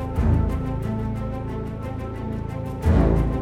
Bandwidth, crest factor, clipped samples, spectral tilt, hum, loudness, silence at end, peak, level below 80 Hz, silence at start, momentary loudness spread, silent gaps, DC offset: 12 kHz; 16 dB; under 0.1%; -9 dB/octave; none; -25 LUFS; 0 s; -6 dBFS; -28 dBFS; 0 s; 11 LU; none; under 0.1%